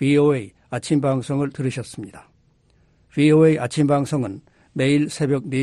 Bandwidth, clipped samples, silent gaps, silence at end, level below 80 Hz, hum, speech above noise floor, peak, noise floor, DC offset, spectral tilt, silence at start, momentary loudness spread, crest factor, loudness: 12 kHz; under 0.1%; none; 0 s; -56 dBFS; none; 40 dB; -4 dBFS; -59 dBFS; under 0.1%; -7 dB/octave; 0 s; 17 LU; 16 dB; -20 LUFS